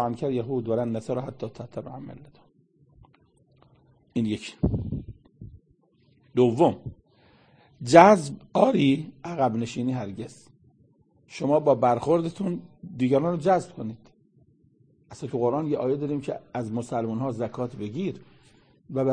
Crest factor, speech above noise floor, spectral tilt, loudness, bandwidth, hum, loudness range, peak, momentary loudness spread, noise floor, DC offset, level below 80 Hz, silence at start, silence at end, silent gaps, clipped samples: 26 dB; 39 dB; -7 dB/octave; -25 LUFS; 9.8 kHz; none; 12 LU; 0 dBFS; 17 LU; -63 dBFS; under 0.1%; -52 dBFS; 0 s; 0 s; none; under 0.1%